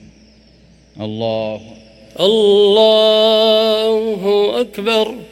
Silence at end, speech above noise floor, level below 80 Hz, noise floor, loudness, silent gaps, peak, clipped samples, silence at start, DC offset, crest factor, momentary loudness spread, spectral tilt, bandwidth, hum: 0.05 s; 34 dB; -54 dBFS; -47 dBFS; -13 LUFS; none; 0 dBFS; under 0.1%; 0.95 s; under 0.1%; 14 dB; 13 LU; -4.5 dB/octave; 14.5 kHz; none